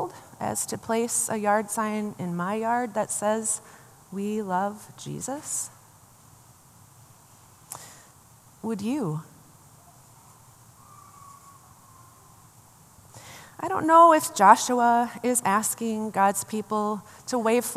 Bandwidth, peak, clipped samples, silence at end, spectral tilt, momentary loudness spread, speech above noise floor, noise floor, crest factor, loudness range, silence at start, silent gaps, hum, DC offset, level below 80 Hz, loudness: 15 kHz; -2 dBFS; under 0.1%; 0 s; -4 dB/octave; 20 LU; 30 dB; -54 dBFS; 24 dB; 17 LU; 0 s; none; none; under 0.1%; -70 dBFS; -24 LUFS